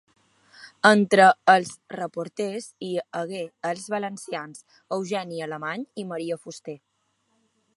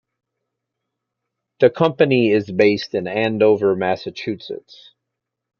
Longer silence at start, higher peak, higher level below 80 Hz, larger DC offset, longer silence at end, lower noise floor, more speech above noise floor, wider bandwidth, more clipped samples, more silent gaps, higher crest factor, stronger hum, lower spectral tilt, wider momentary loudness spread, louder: second, 0.6 s vs 1.6 s; about the same, -2 dBFS vs -2 dBFS; second, -76 dBFS vs -64 dBFS; neither; about the same, 1 s vs 1.05 s; second, -71 dBFS vs -81 dBFS; second, 47 dB vs 63 dB; first, 11.5 kHz vs 6.8 kHz; neither; neither; first, 24 dB vs 18 dB; neither; second, -4.5 dB/octave vs -7 dB/octave; first, 18 LU vs 12 LU; second, -24 LUFS vs -18 LUFS